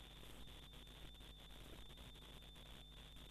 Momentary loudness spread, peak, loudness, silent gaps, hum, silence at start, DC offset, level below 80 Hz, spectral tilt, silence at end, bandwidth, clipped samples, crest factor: 1 LU; -44 dBFS; -59 LUFS; none; none; 0 s; under 0.1%; -62 dBFS; -4 dB/octave; 0 s; 14 kHz; under 0.1%; 14 dB